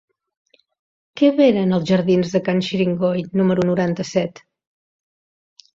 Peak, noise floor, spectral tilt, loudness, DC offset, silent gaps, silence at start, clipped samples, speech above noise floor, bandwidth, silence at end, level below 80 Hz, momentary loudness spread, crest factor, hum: -4 dBFS; under -90 dBFS; -7 dB/octave; -18 LUFS; under 0.1%; none; 1.15 s; under 0.1%; over 73 dB; 7.6 kHz; 1.45 s; -58 dBFS; 7 LU; 16 dB; none